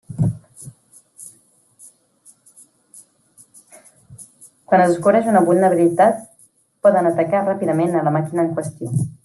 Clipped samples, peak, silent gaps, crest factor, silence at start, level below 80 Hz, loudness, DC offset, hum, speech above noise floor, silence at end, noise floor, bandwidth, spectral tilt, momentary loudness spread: under 0.1%; -2 dBFS; none; 18 dB; 0.1 s; -58 dBFS; -17 LUFS; under 0.1%; none; 39 dB; 0.15 s; -55 dBFS; 12.5 kHz; -7.5 dB/octave; 25 LU